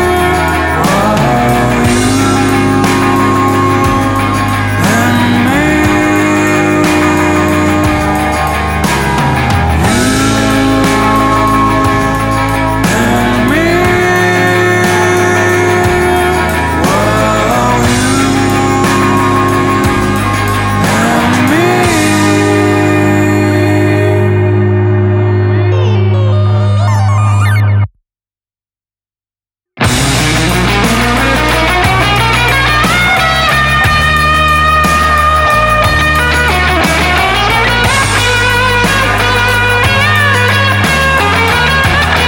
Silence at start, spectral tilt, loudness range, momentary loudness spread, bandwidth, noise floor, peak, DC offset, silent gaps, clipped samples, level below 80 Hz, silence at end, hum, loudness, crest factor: 0 s; -5 dB/octave; 3 LU; 3 LU; 17.5 kHz; under -90 dBFS; 0 dBFS; under 0.1%; none; under 0.1%; -24 dBFS; 0 s; none; -9 LUFS; 10 dB